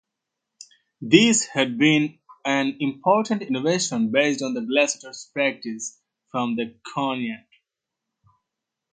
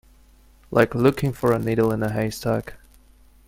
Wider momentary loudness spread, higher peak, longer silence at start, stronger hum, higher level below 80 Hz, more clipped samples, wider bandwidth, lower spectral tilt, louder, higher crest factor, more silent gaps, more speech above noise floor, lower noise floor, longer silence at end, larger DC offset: first, 13 LU vs 7 LU; about the same, 0 dBFS vs 0 dBFS; first, 1 s vs 0.7 s; neither; second, -70 dBFS vs -48 dBFS; neither; second, 9.6 kHz vs 16.5 kHz; second, -3.5 dB/octave vs -7 dB/octave; about the same, -22 LUFS vs -22 LUFS; about the same, 24 dB vs 22 dB; neither; first, 62 dB vs 32 dB; first, -84 dBFS vs -53 dBFS; first, 1.55 s vs 0.7 s; neither